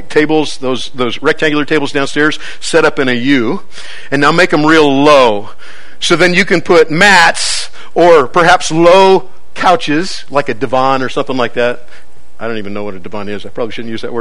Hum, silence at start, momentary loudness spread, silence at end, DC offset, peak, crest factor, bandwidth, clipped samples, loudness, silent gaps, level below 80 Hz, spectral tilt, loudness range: none; 0.1 s; 15 LU; 0 s; 10%; 0 dBFS; 12 dB; 13 kHz; 1%; -10 LUFS; none; -42 dBFS; -4 dB/octave; 8 LU